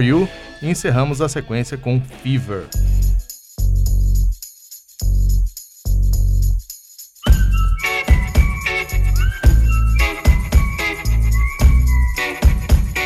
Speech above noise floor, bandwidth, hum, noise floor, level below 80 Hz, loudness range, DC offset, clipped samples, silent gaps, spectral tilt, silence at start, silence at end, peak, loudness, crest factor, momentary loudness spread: 24 dB; 15.5 kHz; none; -41 dBFS; -16 dBFS; 4 LU; under 0.1%; under 0.1%; none; -5.5 dB/octave; 0 s; 0 s; -2 dBFS; -18 LUFS; 14 dB; 10 LU